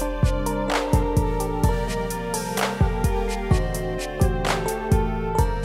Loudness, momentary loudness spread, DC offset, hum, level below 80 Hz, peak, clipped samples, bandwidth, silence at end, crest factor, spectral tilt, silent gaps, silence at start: -24 LUFS; 5 LU; under 0.1%; none; -28 dBFS; -6 dBFS; under 0.1%; 16 kHz; 0 s; 16 dB; -5.5 dB/octave; none; 0 s